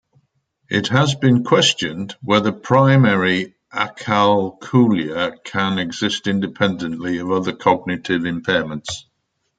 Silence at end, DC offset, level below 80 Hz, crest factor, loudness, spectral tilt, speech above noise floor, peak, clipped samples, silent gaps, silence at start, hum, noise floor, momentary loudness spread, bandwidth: 0.6 s; under 0.1%; -58 dBFS; 18 dB; -18 LUFS; -5.5 dB/octave; 48 dB; 0 dBFS; under 0.1%; none; 0.7 s; none; -66 dBFS; 10 LU; 9.2 kHz